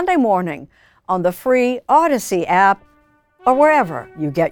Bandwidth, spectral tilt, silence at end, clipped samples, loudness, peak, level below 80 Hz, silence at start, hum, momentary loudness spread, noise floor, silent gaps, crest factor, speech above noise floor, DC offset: 19.5 kHz; -5.5 dB/octave; 0 s; under 0.1%; -17 LUFS; -2 dBFS; -54 dBFS; 0 s; none; 11 LU; -56 dBFS; none; 16 dB; 40 dB; under 0.1%